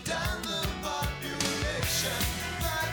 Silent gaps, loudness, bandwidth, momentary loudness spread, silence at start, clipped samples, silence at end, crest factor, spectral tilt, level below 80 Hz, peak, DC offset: none; -30 LUFS; over 20 kHz; 4 LU; 0 s; under 0.1%; 0 s; 16 dB; -3 dB/octave; -40 dBFS; -14 dBFS; under 0.1%